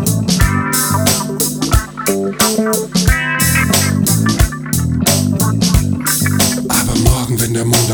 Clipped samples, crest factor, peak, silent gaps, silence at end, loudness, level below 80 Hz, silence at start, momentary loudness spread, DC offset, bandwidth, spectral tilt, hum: under 0.1%; 14 dB; 0 dBFS; none; 0 s; -13 LUFS; -24 dBFS; 0 s; 4 LU; under 0.1%; over 20 kHz; -4 dB/octave; none